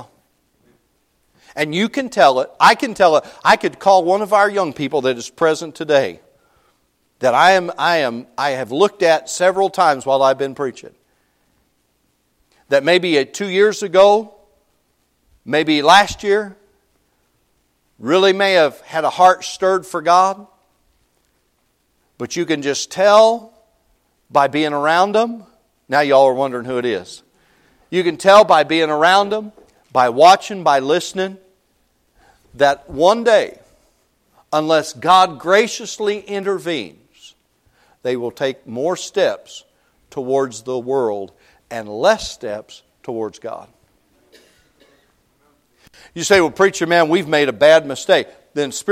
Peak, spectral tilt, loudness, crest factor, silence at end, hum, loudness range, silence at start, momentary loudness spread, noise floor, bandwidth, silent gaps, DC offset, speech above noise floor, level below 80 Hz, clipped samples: 0 dBFS; -3.5 dB/octave; -16 LUFS; 18 dB; 0 s; none; 8 LU; 0 s; 14 LU; -64 dBFS; 15.5 kHz; none; under 0.1%; 49 dB; -56 dBFS; under 0.1%